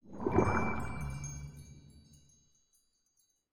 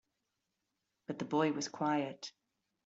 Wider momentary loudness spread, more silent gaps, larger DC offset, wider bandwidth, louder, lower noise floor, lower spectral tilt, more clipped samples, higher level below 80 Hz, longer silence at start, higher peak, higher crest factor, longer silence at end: first, 21 LU vs 16 LU; neither; neither; first, 17 kHz vs 7.8 kHz; about the same, -35 LUFS vs -36 LUFS; second, -76 dBFS vs -86 dBFS; first, -7 dB/octave vs -4.5 dB/octave; neither; first, -52 dBFS vs -82 dBFS; second, 0 s vs 1.1 s; about the same, -16 dBFS vs -18 dBFS; about the same, 22 dB vs 20 dB; second, 0 s vs 0.55 s